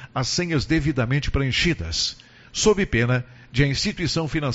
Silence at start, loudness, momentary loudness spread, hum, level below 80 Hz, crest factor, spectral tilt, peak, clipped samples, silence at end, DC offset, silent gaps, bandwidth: 0 s; -22 LUFS; 6 LU; none; -36 dBFS; 18 dB; -4.5 dB/octave; -4 dBFS; under 0.1%; 0 s; under 0.1%; none; 8 kHz